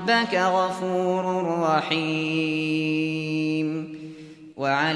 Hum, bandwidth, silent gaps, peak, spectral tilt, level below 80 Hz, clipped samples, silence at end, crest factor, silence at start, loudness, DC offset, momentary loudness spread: none; 11 kHz; none; -8 dBFS; -5.5 dB/octave; -70 dBFS; under 0.1%; 0 s; 16 dB; 0 s; -24 LUFS; under 0.1%; 13 LU